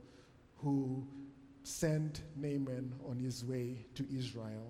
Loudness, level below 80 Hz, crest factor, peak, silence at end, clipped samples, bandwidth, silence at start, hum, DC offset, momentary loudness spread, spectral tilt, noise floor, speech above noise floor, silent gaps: -40 LUFS; -64 dBFS; 18 dB; -22 dBFS; 0 s; under 0.1%; 16 kHz; 0 s; none; under 0.1%; 14 LU; -6 dB/octave; -62 dBFS; 23 dB; none